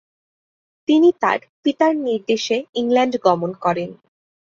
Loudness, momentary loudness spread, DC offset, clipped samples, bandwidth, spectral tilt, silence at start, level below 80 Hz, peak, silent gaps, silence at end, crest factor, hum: -19 LUFS; 8 LU; under 0.1%; under 0.1%; 7.4 kHz; -5 dB/octave; 0.9 s; -66 dBFS; -2 dBFS; 1.49-1.63 s, 2.69-2.73 s; 0.55 s; 18 dB; none